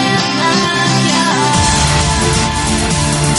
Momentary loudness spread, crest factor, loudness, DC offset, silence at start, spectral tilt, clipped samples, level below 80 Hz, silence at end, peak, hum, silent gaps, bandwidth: 3 LU; 12 dB; -12 LUFS; under 0.1%; 0 s; -3.5 dB/octave; under 0.1%; -24 dBFS; 0 s; 0 dBFS; none; none; 11.5 kHz